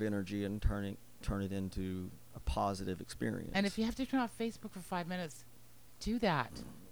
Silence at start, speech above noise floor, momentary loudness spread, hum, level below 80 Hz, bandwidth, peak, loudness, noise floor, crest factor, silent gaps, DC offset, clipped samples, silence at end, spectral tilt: 0 s; 24 dB; 11 LU; none; -48 dBFS; over 20 kHz; -18 dBFS; -38 LUFS; -62 dBFS; 20 dB; none; 0.2%; under 0.1%; 0 s; -6 dB/octave